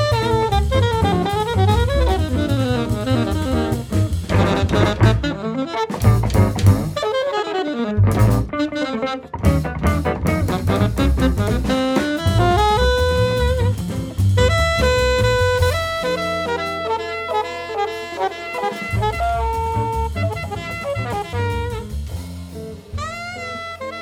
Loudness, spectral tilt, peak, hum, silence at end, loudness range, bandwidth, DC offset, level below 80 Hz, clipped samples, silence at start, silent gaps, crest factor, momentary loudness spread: -19 LUFS; -6 dB/octave; -2 dBFS; none; 0 s; 5 LU; 16 kHz; under 0.1%; -28 dBFS; under 0.1%; 0 s; none; 16 dB; 10 LU